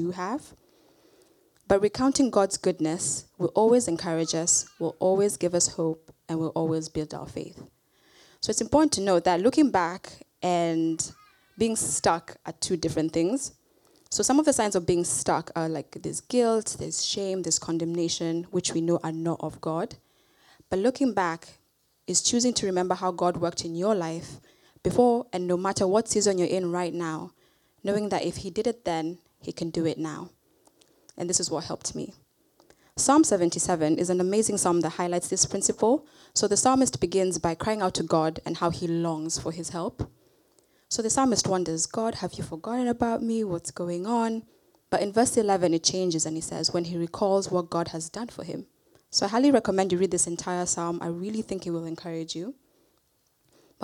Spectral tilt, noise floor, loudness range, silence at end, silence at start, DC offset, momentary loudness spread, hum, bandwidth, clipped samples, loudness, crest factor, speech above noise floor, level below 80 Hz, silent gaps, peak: -4 dB/octave; -69 dBFS; 5 LU; 0 s; 0 s; under 0.1%; 12 LU; none; 14.5 kHz; under 0.1%; -26 LUFS; 20 dB; 43 dB; -58 dBFS; none; -8 dBFS